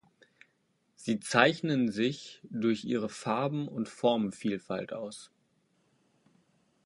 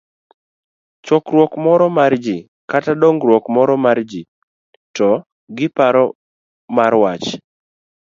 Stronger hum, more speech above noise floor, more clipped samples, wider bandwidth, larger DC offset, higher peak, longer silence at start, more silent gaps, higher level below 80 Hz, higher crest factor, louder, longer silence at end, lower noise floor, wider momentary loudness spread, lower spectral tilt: neither; second, 43 dB vs over 76 dB; neither; first, 11.5 kHz vs 7.4 kHz; neither; second, -6 dBFS vs 0 dBFS; about the same, 1 s vs 1.05 s; second, none vs 2.48-2.68 s, 4.28-4.94 s, 5.26-5.47 s, 6.15-6.68 s; second, -74 dBFS vs -64 dBFS; first, 28 dB vs 16 dB; second, -31 LUFS vs -15 LUFS; first, 1.6 s vs 0.75 s; second, -74 dBFS vs under -90 dBFS; first, 16 LU vs 13 LU; second, -5 dB/octave vs -6.5 dB/octave